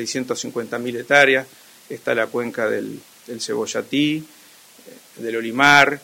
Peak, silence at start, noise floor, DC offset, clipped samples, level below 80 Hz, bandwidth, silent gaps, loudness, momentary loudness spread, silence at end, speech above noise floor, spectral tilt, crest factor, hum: 0 dBFS; 0 s; -48 dBFS; under 0.1%; under 0.1%; -64 dBFS; 16.5 kHz; none; -19 LUFS; 19 LU; 0.05 s; 28 dB; -3.5 dB/octave; 20 dB; none